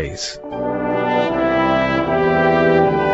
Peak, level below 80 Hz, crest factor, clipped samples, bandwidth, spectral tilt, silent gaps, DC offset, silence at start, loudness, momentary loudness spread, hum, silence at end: -2 dBFS; -40 dBFS; 14 dB; under 0.1%; 8.2 kHz; -5.5 dB/octave; none; under 0.1%; 0 s; -17 LUFS; 11 LU; none; 0 s